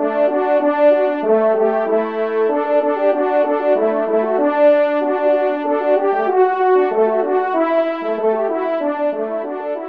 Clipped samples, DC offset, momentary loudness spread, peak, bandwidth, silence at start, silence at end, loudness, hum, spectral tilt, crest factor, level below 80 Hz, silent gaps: under 0.1%; 0.3%; 6 LU; -4 dBFS; 5 kHz; 0 s; 0 s; -16 LUFS; none; -7.5 dB/octave; 12 dB; -70 dBFS; none